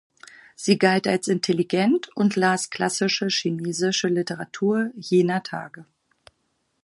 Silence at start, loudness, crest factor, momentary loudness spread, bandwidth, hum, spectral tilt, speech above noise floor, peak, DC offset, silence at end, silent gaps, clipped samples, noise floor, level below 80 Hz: 0.6 s; -22 LUFS; 20 dB; 8 LU; 11.5 kHz; none; -4.5 dB/octave; 49 dB; -4 dBFS; under 0.1%; 1 s; none; under 0.1%; -72 dBFS; -70 dBFS